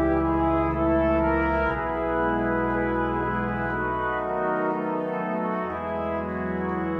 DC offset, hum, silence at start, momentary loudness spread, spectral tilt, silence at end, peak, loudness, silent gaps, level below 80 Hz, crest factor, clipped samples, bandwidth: under 0.1%; none; 0 s; 6 LU; -9.5 dB/octave; 0 s; -12 dBFS; -25 LUFS; none; -38 dBFS; 14 dB; under 0.1%; 5.2 kHz